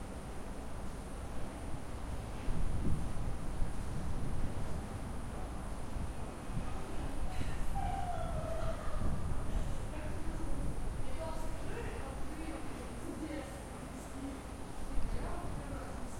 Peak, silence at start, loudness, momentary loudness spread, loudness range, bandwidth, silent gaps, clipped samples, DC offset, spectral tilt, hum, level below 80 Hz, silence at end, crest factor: -20 dBFS; 0 s; -42 LUFS; 6 LU; 3 LU; 13 kHz; none; under 0.1%; under 0.1%; -6 dB/octave; none; -40 dBFS; 0 s; 16 dB